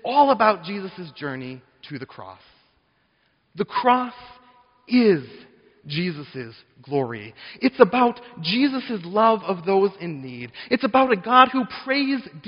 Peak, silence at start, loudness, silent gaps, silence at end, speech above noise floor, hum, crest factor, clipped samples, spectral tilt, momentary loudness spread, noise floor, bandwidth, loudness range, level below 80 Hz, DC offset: 0 dBFS; 0.05 s; -21 LUFS; none; 0 s; 44 dB; none; 22 dB; under 0.1%; -3.5 dB/octave; 19 LU; -66 dBFS; 5.4 kHz; 8 LU; -66 dBFS; under 0.1%